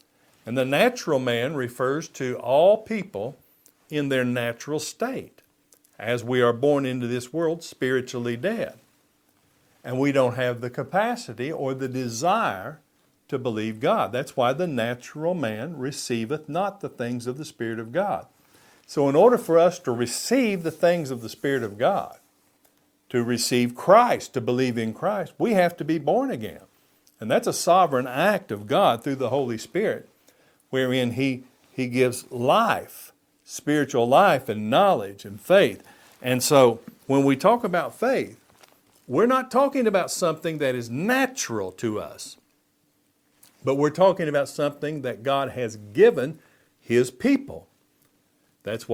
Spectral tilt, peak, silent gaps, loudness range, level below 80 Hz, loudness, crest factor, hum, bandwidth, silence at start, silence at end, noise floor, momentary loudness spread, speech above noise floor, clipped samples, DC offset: -5 dB/octave; -2 dBFS; none; 6 LU; -68 dBFS; -23 LUFS; 22 dB; none; 18 kHz; 0.45 s; 0 s; -67 dBFS; 13 LU; 44 dB; under 0.1%; under 0.1%